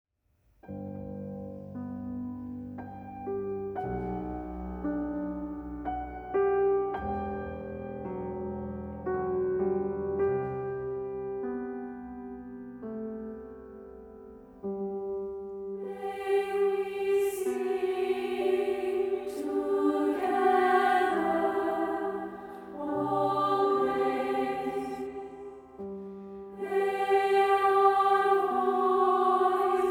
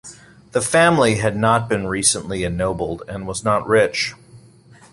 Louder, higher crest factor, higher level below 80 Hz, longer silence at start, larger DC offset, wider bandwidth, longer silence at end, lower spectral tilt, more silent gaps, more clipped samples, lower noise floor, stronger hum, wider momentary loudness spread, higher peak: second, -30 LUFS vs -18 LUFS; about the same, 18 dB vs 18 dB; second, -54 dBFS vs -44 dBFS; first, 0.65 s vs 0.05 s; neither; first, 16 kHz vs 11.5 kHz; second, 0 s vs 0.55 s; first, -6.5 dB/octave vs -4 dB/octave; neither; neither; first, -70 dBFS vs -47 dBFS; neither; first, 17 LU vs 11 LU; second, -12 dBFS vs -2 dBFS